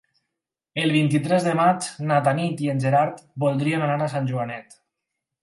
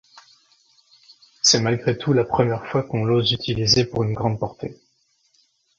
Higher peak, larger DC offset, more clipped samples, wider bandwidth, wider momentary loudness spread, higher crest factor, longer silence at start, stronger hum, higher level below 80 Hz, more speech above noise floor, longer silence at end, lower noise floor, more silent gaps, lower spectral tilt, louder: second, -6 dBFS vs -2 dBFS; neither; neither; first, 11.5 kHz vs 7.8 kHz; second, 7 LU vs 10 LU; about the same, 18 dB vs 20 dB; second, 0.75 s vs 1.45 s; neither; second, -68 dBFS vs -50 dBFS; first, 62 dB vs 45 dB; second, 0.8 s vs 1.05 s; first, -84 dBFS vs -65 dBFS; neither; first, -6 dB/octave vs -4 dB/octave; about the same, -22 LUFS vs -20 LUFS